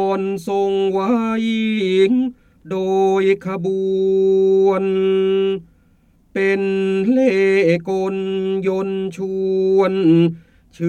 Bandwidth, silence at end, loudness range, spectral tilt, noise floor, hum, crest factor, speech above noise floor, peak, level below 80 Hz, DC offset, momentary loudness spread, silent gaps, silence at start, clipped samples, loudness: 8.8 kHz; 0 s; 1 LU; -7.5 dB/octave; -55 dBFS; none; 12 dB; 38 dB; -4 dBFS; -56 dBFS; under 0.1%; 8 LU; none; 0 s; under 0.1%; -17 LUFS